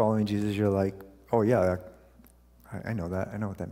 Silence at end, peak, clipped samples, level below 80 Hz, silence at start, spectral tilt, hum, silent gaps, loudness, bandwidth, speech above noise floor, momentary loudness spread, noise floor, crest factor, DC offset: 0 s; -12 dBFS; under 0.1%; -56 dBFS; 0 s; -8 dB/octave; 60 Hz at -50 dBFS; none; -29 LUFS; 16 kHz; 29 dB; 12 LU; -57 dBFS; 18 dB; under 0.1%